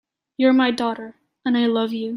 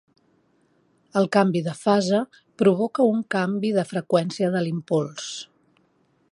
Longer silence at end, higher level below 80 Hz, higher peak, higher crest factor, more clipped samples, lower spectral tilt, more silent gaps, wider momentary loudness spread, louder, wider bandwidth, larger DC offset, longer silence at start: second, 0 s vs 0.9 s; about the same, -68 dBFS vs -70 dBFS; about the same, -6 dBFS vs -4 dBFS; about the same, 16 dB vs 20 dB; neither; about the same, -5.5 dB/octave vs -6 dB/octave; neither; first, 18 LU vs 11 LU; first, -20 LUFS vs -23 LUFS; about the same, 11.5 kHz vs 11.5 kHz; neither; second, 0.4 s vs 1.15 s